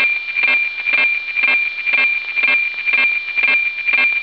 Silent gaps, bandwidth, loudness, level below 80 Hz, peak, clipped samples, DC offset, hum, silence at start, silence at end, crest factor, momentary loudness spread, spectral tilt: none; 5.4 kHz; -14 LUFS; -60 dBFS; -6 dBFS; under 0.1%; 0.2%; none; 0 s; 0 s; 12 dB; 2 LU; -1.5 dB/octave